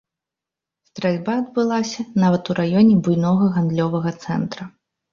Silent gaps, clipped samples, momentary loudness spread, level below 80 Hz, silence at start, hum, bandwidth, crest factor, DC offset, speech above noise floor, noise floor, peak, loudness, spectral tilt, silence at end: none; under 0.1%; 10 LU; -58 dBFS; 0.95 s; none; 7.2 kHz; 16 dB; under 0.1%; 68 dB; -87 dBFS; -4 dBFS; -19 LUFS; -7.5 dB/octave; 0.45 s